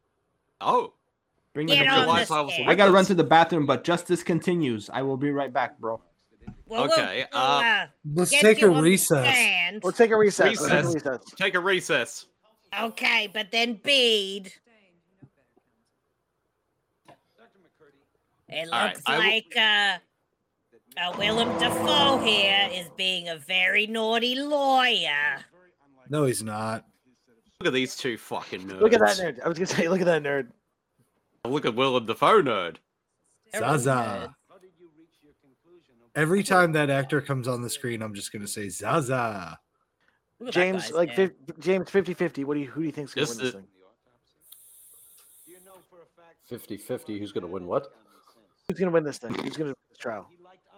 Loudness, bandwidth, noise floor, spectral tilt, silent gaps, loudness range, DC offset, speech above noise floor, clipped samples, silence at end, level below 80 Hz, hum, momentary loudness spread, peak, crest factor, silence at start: -24 LUFS; 16.5 kHz; -76 dBFS; -4 dB/octave; none; 11 LU; under 0.1%; 52 dB; under 0.1%; 0.55 s; -66 dBFS; none; 15 LU; -4 dBFS; 22 dB; 0.6 s